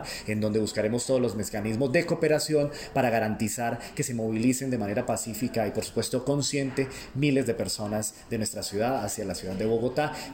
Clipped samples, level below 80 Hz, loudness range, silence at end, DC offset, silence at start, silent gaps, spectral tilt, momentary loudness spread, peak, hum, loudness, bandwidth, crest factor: under 0.1%; -54 dBFS; 2 LU; 0 s; under 0.1%; 0 s; none; -5 dB/octave; 6 LU; -10 dBFS; none; -28 LUFS; 16.5 kHz; 18 dB